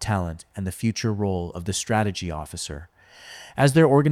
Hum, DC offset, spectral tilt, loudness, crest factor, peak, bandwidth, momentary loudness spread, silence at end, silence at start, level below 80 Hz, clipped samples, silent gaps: none; under 0.1%; -5.5 dB/octave; -24 LUFS; 18 dB; -4 dBFS; 15.5 kHz; 17 LU; 0 s; 0 s; -46 dBFS; under 0.1%; none